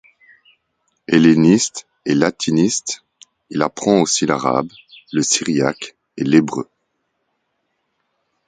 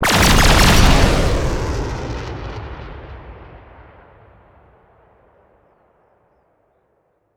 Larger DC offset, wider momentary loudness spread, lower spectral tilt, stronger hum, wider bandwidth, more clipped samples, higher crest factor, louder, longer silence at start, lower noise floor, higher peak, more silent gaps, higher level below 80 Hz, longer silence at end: neither; second, 16 LU vs 25 LU; about the same, -4.5 dB/octave vs -4 dB/octave; neither; second, 9.6 kHz vs 20 kHz; neither; about the same, 18 dB vs 18 dB; about the same, -17 LUFS vs -15 LUFS; first, 1.1 s vs 0 s; first, -71 dBFS vs -64 dBFS; about the same, 0 dBFS vs 0 dBFS; neither; second, -58 dBFS vs -22 dBFS; second, 1.85 s vs 3.8 s